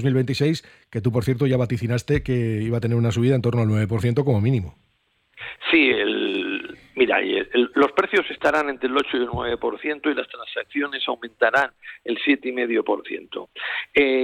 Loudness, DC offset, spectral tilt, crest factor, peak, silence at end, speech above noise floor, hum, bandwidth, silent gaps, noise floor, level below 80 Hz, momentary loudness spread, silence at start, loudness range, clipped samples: -22 LUFS; under 0.1%; -6.5 dB/octave; 16 dB; -6 dBFS; 0 s; 45 dB; none; 13.5 kHz; none; -66 dBFS; -50 dBFS; 10 LU; 0 s; 3 LU; under 0.1%